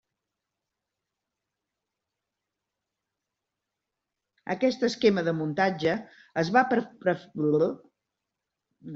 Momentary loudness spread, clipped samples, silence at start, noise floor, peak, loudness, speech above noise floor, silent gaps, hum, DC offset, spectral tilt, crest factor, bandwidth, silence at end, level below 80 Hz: 11 LU; under 0.1%; 4.45 s; -86 dBFS; -6 dBFS; -26 LUFS; 60 dB; none; none; under 0.1%; -4.5 dB/octave; 24 dB; 7.6 kHz; 0 s; -70 dBFS